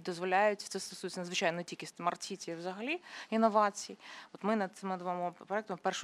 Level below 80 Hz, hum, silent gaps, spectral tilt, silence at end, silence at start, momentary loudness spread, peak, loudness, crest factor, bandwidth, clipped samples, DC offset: -86 dBFS; none; none; -4 dB/octave; 0 s; 0 s; 11 LU; -14 dBFS; -35 LUFS; 20 dB; 14.5 kHz; under 0.1%; under 0.1%